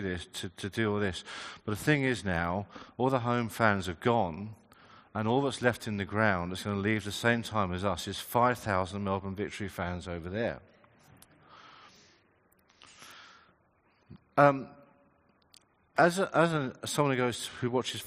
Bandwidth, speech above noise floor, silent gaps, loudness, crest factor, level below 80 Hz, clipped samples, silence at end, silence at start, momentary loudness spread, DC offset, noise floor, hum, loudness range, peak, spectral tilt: 15 kHz; 38 dB; none; -30 LUFS; 26 dB; -64 dBFS; under 0.1%; 0 s; 0 s; 12 LU; under 0.1%; -69 dBFS; none; 8 LU; -6 dBFS; -5.5 dB/octave